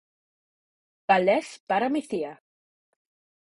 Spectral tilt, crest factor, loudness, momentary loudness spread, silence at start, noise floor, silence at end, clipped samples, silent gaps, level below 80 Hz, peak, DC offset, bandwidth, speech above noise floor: -5 dB/octave; 22 dB; -25 LUFS; 14 LU; 1.1 s; under -90 dBFS; 1.25 s; under 0.1%; 1.60-1.67 s; -72 dBFS; -6 dBFS; under 0.1%; 11.5 kHz; over 65 dB